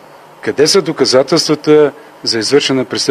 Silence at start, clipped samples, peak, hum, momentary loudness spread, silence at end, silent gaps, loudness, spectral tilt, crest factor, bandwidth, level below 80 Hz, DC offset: 0.45 s; 0.1%; 0 dBFS; none; 8 LU; 0 s; none; -12 LUFS; -3.5 dB/octave; 12 dB; 13.5 kHz; -60 dBFS; under 0.1%